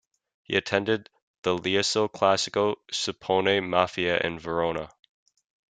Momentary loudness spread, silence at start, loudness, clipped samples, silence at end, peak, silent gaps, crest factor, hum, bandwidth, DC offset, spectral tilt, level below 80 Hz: 6 LU; 0.5 s; -26 LUFS; under 0.1%; 0.9 s; -4 dBFS; 1.22-1.43 s; 22 dB; none; 9.4 kHz; under 0.1%; -3.5 dB/octave; -62 dBFS